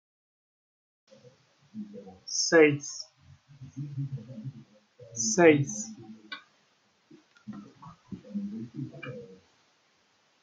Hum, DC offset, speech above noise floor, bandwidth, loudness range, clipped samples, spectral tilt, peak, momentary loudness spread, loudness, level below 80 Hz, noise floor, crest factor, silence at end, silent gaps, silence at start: none; under 0.1%; 41 dB; 9.4 kHz; 14 LU; under 0.1%; -4 dB/octave; -6 dBFS; 25 LU; -27 LUFS; -76 dBFS; -68 dBFS; 24 dB; 1.1 s; none; 1.75 s